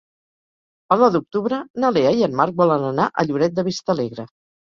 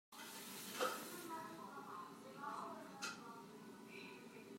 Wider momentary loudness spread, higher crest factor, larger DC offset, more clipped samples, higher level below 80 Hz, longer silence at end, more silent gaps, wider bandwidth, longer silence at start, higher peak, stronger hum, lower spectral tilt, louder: second, 8 LU vs 12 LU; second, 18 dB vs 24 dB; neither; neither; first, -60 dBFS vs under -90 dBFS; first, 0.5 s vs 0 s; first, 1.70-1.74 s vs none; second, 7.4 kHz vs 16 kHz; first, 0.9 s vs 0.1 s; first, -2 dBFS vs -28 dBFS; neither; first, -6.5 dB/octave vs -2.5 dB/octave; first, -19 LUFS vs -50 LUFS